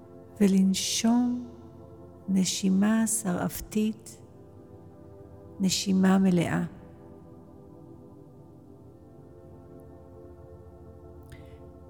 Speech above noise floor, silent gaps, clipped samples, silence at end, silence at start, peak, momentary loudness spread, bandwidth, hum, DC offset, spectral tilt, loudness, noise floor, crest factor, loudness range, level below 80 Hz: 25 dB; none; under 0.1%; 0.05 s; 0 s; -12 dBFS; 26 LU; 18.5 kHz; none; under 0.1%; -5 dB/octave; -26 LUFS; -50 dBFS; 18 dB; 23 LU; -56 dBFS